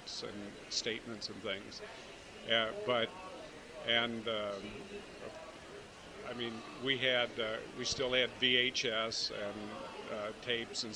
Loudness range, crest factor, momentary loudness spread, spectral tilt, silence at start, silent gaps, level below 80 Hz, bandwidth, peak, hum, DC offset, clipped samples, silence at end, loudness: 6 LU; 22 dB; 17 LU; -2.5 dB/octave; 0 s; none; -66 dBFS; 16 kHz; -16 dBFS; none; under 0.1%; under 0.1%; 0 s; -35 LUFS